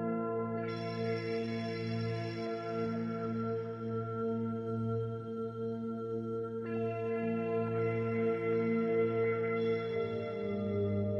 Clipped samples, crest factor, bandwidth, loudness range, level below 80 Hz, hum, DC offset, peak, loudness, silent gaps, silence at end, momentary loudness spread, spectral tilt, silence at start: under 0.1%; 12 dB; 7.2 kHz; 4 LU; -70 dBFS; none; under 0.1%; -22 dBFS; -35 LUFS; none; 0 s; 6 LU; -9 dB/octave; 0 s